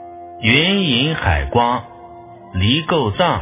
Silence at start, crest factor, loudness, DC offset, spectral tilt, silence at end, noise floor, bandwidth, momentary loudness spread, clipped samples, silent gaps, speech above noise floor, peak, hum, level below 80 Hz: 0 s; 18 dB; -16 LUFS; under 0.1%; -9.5 dB/octave; 0 s; -38 dBFS; 3.9 kHz; 9 LU; under 0.1%; none; 22 dB; 0 dBFS; none; -30 dBFS